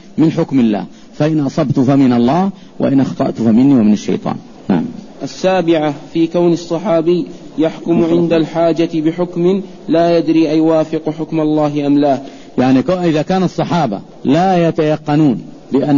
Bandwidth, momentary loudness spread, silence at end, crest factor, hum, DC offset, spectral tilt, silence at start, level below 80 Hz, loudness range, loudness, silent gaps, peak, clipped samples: 7.4 kHz; 8 LU; 0 s; 10 dB; none; 0.8%; -7.5 dB/octave; 0.15 s; -48 dBFS; 2 LU; -14 LUFS; none; -2 dBFS; under 0.1%